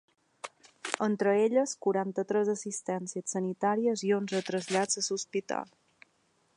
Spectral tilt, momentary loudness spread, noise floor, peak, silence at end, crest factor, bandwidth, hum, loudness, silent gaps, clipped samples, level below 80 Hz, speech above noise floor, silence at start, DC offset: -4 dB/octave; 13 LU; -71 dBFS; -10 dBFS; 0.95 s; 22 dB; 11 kHz; none; -30 LUFS; none; under 0.1%; -84 dBFS; 41 dB; 0.45 s; under 0.1%